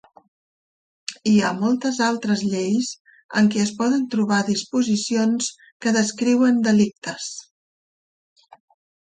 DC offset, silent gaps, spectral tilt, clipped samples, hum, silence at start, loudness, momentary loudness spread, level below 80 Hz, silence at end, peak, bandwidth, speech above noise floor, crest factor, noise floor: under 0.1%; 3.00-3.05 s, 3.24-3.29 s, 5.72-5.80 s; -4.5 dB/octave; under 0.1%; none; 1.1 s; -21 LUFS; 12 LU; -66 dBFS; 1.65 s; -6 dBFS; 9.4 kHz; over 70 dB; 16 dB; under -90 dBFS